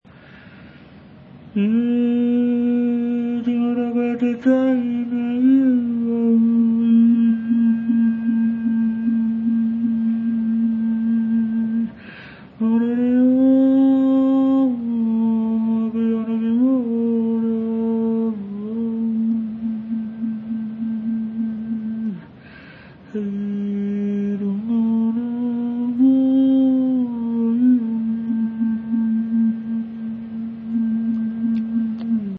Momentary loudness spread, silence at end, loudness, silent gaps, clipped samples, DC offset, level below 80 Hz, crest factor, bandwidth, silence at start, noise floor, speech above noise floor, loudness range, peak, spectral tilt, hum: 10 LU; 0 s; -20 LUFS; none; under 0.1%; under 0.1%; -60 dBFS; 14 dB; 3.9 kHz; 0.3 s; -44 dBFS; 26 dB; 7 LU; -6 dBFS; -10 dB/octave; none